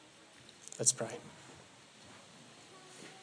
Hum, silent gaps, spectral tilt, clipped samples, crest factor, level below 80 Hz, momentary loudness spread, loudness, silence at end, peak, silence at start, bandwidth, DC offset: none; none; -1.5 dB/octave; under 0.1%; 30 dB; -84 dBFS; 26 LU; -33 LUFS; 0 s; -12 dBFS; 0 s; 10.5 kHz; under 0.1%